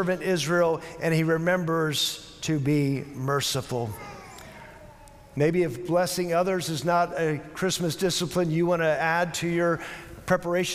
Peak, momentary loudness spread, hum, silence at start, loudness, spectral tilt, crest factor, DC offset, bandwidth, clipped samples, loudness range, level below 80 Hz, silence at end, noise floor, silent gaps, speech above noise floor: -10 dBFS; 12 LU; none; 0 s; -26 LUFS; -5 dB/octave; 16 dB; under 0.1%; 16 kHz; under 0.1%; 3 LU; -56 dBFS; 0 s; -48 dBFS; none; 23 dB